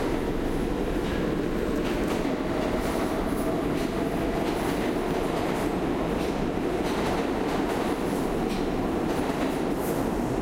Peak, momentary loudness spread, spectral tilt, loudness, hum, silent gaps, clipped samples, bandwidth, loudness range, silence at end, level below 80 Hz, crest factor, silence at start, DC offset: -14 dBFS; 1 LU; -6 dB/octave; -27 LUFS; none; none; under 0.1%; 16 kHz; 0 LU; 0 s; -38 dBFS; 12 dB; 0 s; under 0.1%